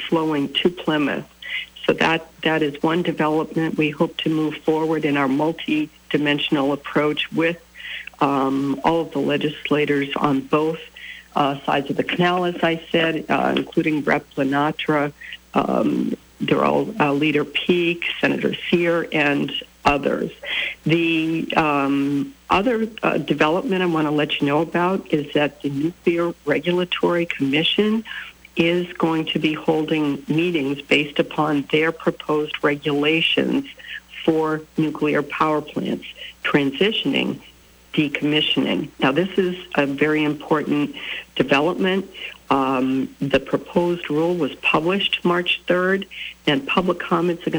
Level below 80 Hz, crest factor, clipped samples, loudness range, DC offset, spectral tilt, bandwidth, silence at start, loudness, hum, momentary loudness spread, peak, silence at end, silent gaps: -54 dBFS; 14 dB; under 0.1%; 2 LU; under 0.1%; -6 dB/octave; over 20 kHz; 0 s; -21 LUFS; none; 6 LU; -6 dBFS; 0 s; none